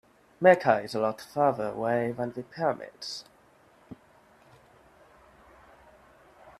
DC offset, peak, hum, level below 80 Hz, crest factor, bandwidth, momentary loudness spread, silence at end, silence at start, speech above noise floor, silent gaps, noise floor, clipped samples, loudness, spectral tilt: under 0.1%; -6 dBFS; none; -68 dBFS; 24 dB; 13 kHz; 16 LU; 0.1 s; 0.4 s; 33 dB; none; -60 dBFS; under 0.1%; -27 LUFS; -5.5 dB/octave